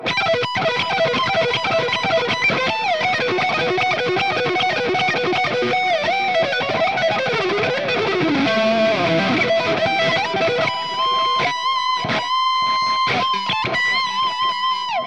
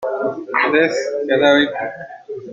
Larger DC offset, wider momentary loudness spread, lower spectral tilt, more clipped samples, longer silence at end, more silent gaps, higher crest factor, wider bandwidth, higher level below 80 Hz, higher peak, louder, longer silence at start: first, 0.4% vs under 0.1%; second, 2 LU vs 18 LU; about the same, -4 dB/octave vs -4.5 dB/octave; neither; about the same, 0 s vs 0 s; neither; about the same, 12 dB vs 16 dB; first, 10 kHz vs 7.8 kHz; about the same, -58 dBFS vs -60 dBFS; second, -6 dBFS vs -2 dBFS; about the same, -18 LUFS vs -17 LUFS; about the same, 0 s vs 0 s